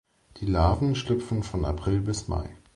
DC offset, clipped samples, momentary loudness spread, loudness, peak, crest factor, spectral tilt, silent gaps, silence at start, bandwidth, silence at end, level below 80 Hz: under 0.1%; under 0.1%; 9 LU; -27 LUFS; -8 dBFS; 18 dB; -6.5 dB/octave; none; 0.35 s; 11 kHz; 0.2 s; -34 dBFS